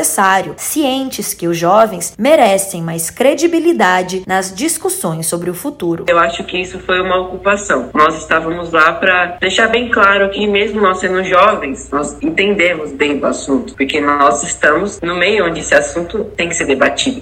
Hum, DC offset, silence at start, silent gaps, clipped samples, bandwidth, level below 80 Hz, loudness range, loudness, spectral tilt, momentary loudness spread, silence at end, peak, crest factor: none; under 0.1%; 0 s; none; 0.2%; 17 kHz; -42 dBFS; 3 LU; -13 LUFS; -3 dB/octave; 9 LU; 0 s; 0 dBFS; 14 dB